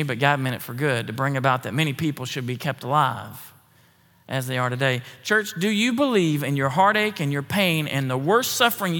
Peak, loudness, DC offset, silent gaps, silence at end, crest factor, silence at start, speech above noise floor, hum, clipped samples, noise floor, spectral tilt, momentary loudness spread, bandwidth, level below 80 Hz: -2 dBFS; -22 LUFS; under 0.1%; none; 0 s; 20 dB; 0 s; 35 dB; none; under 0.1%; -57 dBFS; -5 dB/octave; 9 LU; 18 kHz; -72 dBFS